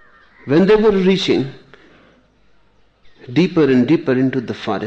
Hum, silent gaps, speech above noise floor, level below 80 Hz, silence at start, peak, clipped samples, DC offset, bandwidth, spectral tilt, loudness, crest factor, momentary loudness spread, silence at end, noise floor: none; none; 42 dB; -46 dBFS; 0.45 s; -4 dBFS; under 0.1%; under 0.1%; 8.2 kHz; -7 dB/octave; -15 LUFS; 14 dB; 11 LU; 0 s; -56 dBFS